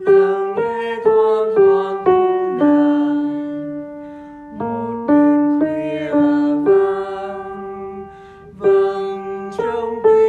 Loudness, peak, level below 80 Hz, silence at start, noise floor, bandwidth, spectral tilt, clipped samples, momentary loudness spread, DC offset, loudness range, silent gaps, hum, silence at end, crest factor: -17 LUFS; -2 dBFS; -56 dBFS; 0 s; -39 dBFS; 4.6 kHz; -8 dB/octave; under 0.1%; 16 LU; under 0.1%; 4 LU; none; none; 0 s; 14 dB